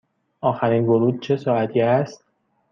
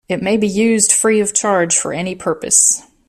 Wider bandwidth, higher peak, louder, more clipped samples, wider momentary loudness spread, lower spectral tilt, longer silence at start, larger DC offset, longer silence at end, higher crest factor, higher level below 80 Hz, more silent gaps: second, 7 kHz vs 17.5 kHz; second, -4 dBFS vs 0 dBFS; second, -20 LUFS vs -13 LUFS; neither; second, 6 LU vs 11 LU; first, -8 dB/octave vs -3 dB/octave; first, 0.45 s vs 0.1 s; neither; first, 0.55 s vs 0.3 s; about the same, 16 dB vs 16 dB; second, -66 dBFS vs -54 dBFS; neither